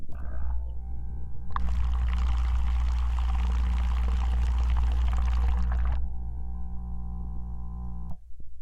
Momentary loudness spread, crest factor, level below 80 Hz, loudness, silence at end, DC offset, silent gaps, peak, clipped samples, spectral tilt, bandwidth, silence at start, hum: 11 LU; 10 dB; -28 dBFS; -31 LUFS; 0 s; under 0.1%; none; -16 dBFS; under 0.1%; -7 dB/octave; 5.4 kHz; 0 s; 60 Hz at -25 dBFS